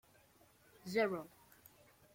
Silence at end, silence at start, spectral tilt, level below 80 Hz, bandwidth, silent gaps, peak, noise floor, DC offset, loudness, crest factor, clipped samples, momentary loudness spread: 0.9 s; 0.85 s; -5 dB/octave; -80 dBFS; 16.5 kHz; none; -22 dBFS; -68 dBFS; under 0.1%; -39 LUFS; 22 dB; under 0.1%; 25 LU